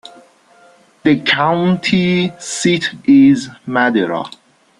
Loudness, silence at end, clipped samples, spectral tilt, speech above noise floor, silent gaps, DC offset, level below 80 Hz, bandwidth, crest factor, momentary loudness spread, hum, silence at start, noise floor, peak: -14 LUFS; 0.5 s; under 0.1%; -5 dB/octave; 34 dB; none; under 0.1%; -56 dBFS; 11.5 kHz; 14 dB; 10 LU; none; 1.05 s; -48 dBFS; -2 dBFS